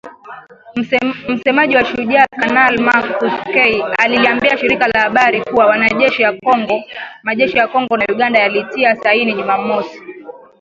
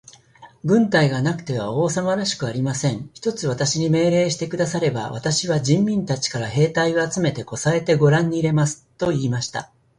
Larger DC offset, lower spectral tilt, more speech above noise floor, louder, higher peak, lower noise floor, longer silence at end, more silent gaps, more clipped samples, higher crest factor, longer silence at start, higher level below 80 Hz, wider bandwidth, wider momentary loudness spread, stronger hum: neither; about the same, -5 dB/octave vs -5 dB/octave; second, 20 dB vs 28 dB; first, -13 LUFS vs -21 LUFS; first, 0 dBFS vs -4 dBFS; second, -34 dBFS vs -48 dBFS; about the same, 0.25 s vs 0.35 s; neither; neither; about the same, 14 dB vs 16 dB; second, 0.05 s vs 0.4 s; about the same, -52 dBFS vs -54 dBFS; second, 7.6 kHz vs 11.5 kHz; about the same, 9 LU vs 8 LU; neither